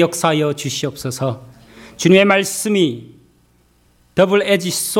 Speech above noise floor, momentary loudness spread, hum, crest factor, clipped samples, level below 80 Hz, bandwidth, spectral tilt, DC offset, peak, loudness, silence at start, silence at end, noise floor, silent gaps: 40 dB; 12 LU; none; 18 dB; under 0.1%; -56 dBFS; 17 kHz; -4.5 dB/octave; under 0.1%; 0 dBFS; -16 LUFS; 0 s; 0 s; -56 dBFS; none